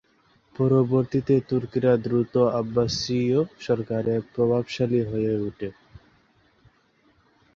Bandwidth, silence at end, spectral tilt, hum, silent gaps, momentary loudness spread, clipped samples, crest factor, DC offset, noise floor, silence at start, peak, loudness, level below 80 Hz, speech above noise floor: 7.4 kHz; 1.85 s; -7 dB/octave; none; none; 6 LU; under 0.1%; 16 dB; under 0.1%; -63 dBFS; 0.6 s; -8 dBFS; -24 LUFS; -54 dBFS; 40 dB